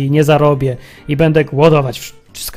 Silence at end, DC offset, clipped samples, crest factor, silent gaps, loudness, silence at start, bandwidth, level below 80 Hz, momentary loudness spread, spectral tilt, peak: 0 s; under 0.1%; 0.3%; 14 dB; none; -13 LUFS; 0 s; 16 kHz; -38 dBFS; 17 LU; -6.5 dB/octave; 0 dBFS